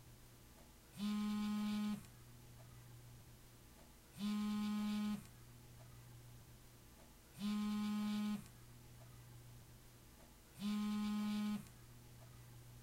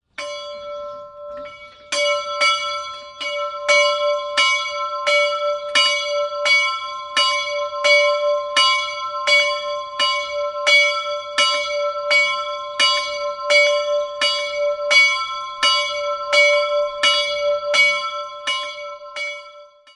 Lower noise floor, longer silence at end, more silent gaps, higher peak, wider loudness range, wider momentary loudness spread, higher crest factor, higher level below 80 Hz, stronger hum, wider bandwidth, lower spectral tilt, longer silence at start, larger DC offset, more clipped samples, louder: first, -62 dBFS vs -43 dBFS; second, 0 s vs 0.3 s; neither; second, -34 dBFS vs -2 dBFS; about the same, 1 LU vs 3 LU; first, 21 LU vs 15 LU; second, 12 dB vs 18 dB; about the same, -68 dBFS vs -64 dBFS; neither; first, 16 kHz vs 11.5 kHz; first, -5.5 dB/octave vs 2 dB/octave; second, 0 s vs 0.2 s; neither; neither; second, -43 LUFS vs -17 LUFS